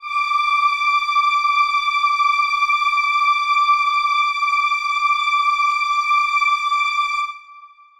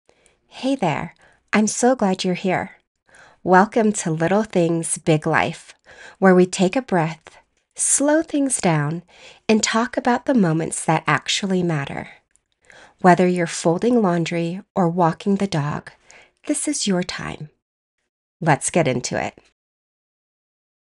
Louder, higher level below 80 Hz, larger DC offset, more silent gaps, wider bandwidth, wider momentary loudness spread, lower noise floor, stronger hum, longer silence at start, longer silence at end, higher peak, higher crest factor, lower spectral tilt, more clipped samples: first, -17 LUFS vs -20 LUFS; second, -66 dBFS vs -58 dBFS; neither; second, none vs 2.87-2.95 s, 14.70-14.75 s, 17.62-17.98 s, 18.09-18.40 s; about the same, 12.5 kHz vs 11.5 kHz; second, 2 LU vs 13 LU; second, -44 dBFS vs -51 dBFS; neither; second, 0 s vs 0.55 s; second, 0.3 s vs 1.55 s; second, -6 dBFS vs 0 dBFS; second, 12 dB vs 20 dB; second, 5.5 dB/octave vs -4.5 dB/octave; neither